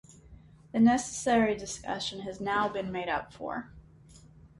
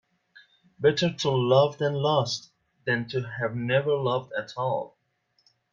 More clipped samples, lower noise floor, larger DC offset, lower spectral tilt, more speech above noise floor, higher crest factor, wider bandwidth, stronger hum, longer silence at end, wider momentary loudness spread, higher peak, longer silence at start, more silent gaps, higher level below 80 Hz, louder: neither; second, -55 dBFS vs -72 dBFS; neither; second, -4 dB/octave vs -5.5 dB/octave; second, 26 dB vs 47 dB; about the same, 18 dB vs 20 dB; first, 11.5 kHz vs 7.6 kHz; neither; second, 0.1 s vs 0.85 s; about the same, 13 LU vs 11 LU; second, -12 dBFS vs -8 dBFS; second, 0.1 s vs 0.8 s; neither; first, -58 dBFS vs -66 dBFS; second, -30 LUFS vs -26 LUFS